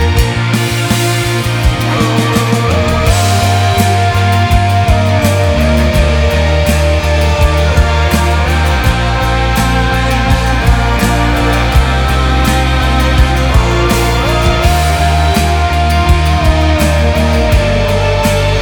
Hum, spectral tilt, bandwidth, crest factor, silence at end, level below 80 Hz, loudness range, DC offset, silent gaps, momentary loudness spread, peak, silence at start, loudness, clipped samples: none; -5.5 dB/octave; over 20 kHz; 10 dB; 0 s; -14 dBFS; 1 LU; under 0.1%; none; 2 LU; 0 dBFS; 0 s; -11 LUFS; under 0.1%